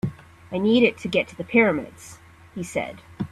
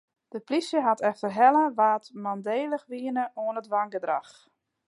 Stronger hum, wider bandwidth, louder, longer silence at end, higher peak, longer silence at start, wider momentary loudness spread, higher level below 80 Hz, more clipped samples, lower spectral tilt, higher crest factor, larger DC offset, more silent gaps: neither; first, 13 kHz vs 11.5 kHz; first, -22 LUFS vs -26 LUFS; second, 0.05 s vs 0.65 s; about the same, -6 dBFS vs -8 dBFS; second, 0.05 s vs 0.35 s; first, 21 LU vs 12 LU; first, -56 dBFS vs -84 dBFS; neither; about the same, -5.5 dB/octave vs -5.5 dB/octave; about the same, 18 dB vs 20 dB; neither; neither